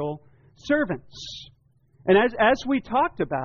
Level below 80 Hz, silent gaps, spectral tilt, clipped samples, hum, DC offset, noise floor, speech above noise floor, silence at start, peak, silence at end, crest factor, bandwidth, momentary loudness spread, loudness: -52 dBFS; none; -3.5 dB/octave; under 0.1%; none; under 0.1%; -60 dBFS; 37 dB; 0 s; -8 dBFS; 0 s; 16 dB; 7.2 kHz; 19 LU; -23 LUFS